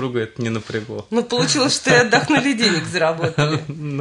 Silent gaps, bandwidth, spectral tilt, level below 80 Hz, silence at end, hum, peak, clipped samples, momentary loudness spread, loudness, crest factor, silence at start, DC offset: none; 11 kHz; -4 dB/octave; -56 dBFS; 0 s; none; -2 dBFS; under 0.1%; 11 LU; -18 LUFS; 16 dB; 0 s; under 0.1%